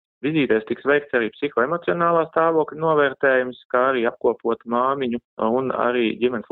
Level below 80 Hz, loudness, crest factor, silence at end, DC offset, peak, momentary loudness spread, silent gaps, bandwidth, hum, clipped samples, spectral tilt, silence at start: -64 dBFS; -21 LUFS; 16 dB; 0.1 s; under 0.1%; -4 dBFS; 5 LU; 3.65-3.70 s, 5.24-5.37 s; 4.2 kHz; none; under 0.1%; -9.5 dB/octave; 0.25 s